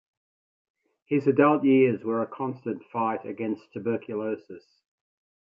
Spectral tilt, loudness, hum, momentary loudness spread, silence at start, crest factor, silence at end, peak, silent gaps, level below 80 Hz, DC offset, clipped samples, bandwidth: -10 dB/octave; -26 LUFS; none; 12 LU; 1.1 s; 20 dB; 0.95 s; -6 dBFS; none; -74 dBFS; under 0.1%; under 0.1%; 5.2 kHz